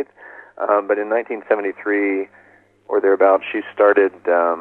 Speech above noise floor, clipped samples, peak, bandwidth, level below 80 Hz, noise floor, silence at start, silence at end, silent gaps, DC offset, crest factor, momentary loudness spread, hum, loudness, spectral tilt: 25 dB; under 0.1%; -2 dBFS; 4 kHz; -76 dBFS; -42 dBFS; 0 s; 0 s; none; under 0.1%; 16 dB; 11 LU; none; -18 LUFS; -7 dB/octave